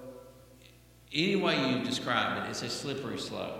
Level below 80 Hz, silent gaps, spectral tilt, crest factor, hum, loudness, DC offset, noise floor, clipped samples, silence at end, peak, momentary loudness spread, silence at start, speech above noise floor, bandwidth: -64 dBFS; none; -4 dB/octave; 22 dB; 60 Hz at -60 dBFS; -31 LUFS; under 0.1%; -57 dBFS; under 0.1%; 0 s; -12 dBFS; 9 LU; 0 s; 25 dB; 16.5 kHz